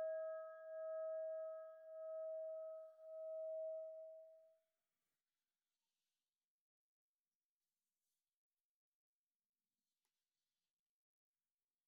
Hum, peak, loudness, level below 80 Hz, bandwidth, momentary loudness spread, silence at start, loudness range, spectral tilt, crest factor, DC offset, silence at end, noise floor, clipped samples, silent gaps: none; -40 dBFS; -50 LUFS; under -90 dBFS; 1.8 kHz; 10 LU; 0 s; 8 LU; 8 dB/octave; 14 dB; under 0.1%; 7.35 s; under -90 dBFS; under 0.1%; none